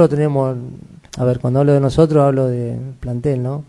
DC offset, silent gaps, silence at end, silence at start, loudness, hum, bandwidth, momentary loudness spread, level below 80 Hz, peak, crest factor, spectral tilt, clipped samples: under 0.1%; none; 0.05 s; 0 s; -16 LUFS; none; 11 kHz; 14 LU; -42 dBFS; 0 dBFS; 16 dB; -8.5 dB/octave; under 0.1%